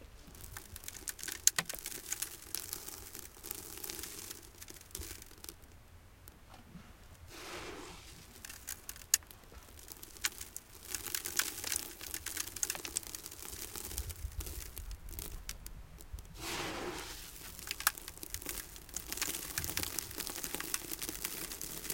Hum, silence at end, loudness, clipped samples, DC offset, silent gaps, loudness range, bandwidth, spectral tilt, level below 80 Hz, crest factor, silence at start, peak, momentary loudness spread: none; 0 s; -39 LUFS; under 0.1%; under 0.1%; none; 11 LU; 17 kHz; -1 dB/octave; -54 dBFS; 36 dB; 0 s; -6 dBFS; 18 LU